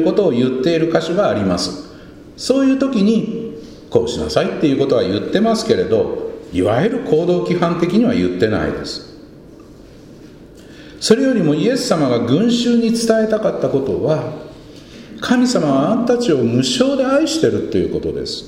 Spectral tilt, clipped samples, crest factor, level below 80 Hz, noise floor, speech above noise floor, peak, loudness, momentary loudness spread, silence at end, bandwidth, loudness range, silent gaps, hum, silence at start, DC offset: -5.5 dB/octave; under 0.1%; 16 dB; -44 dBFS; -39 dBFS; 24 dB; 0 dBFS; -16 LUFS; 10 LU; 0 s; 15.5 kHz; 4 LU; none; none; 0 s; under 0.1%